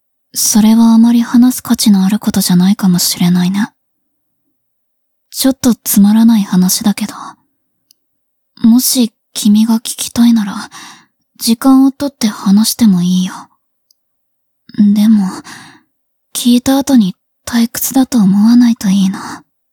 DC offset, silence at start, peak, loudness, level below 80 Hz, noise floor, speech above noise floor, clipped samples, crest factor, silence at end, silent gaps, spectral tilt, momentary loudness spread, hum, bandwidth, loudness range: under 0.1%; 0.35 s; 0 dBFS; -10 LUFS; -50 dBFS; -65 dBFS; 55 dB; under 0.1%; 12 dB; 0.35 s; none; -5 dB/octave; 13 LU; none; 19.5 kHz; 4 LU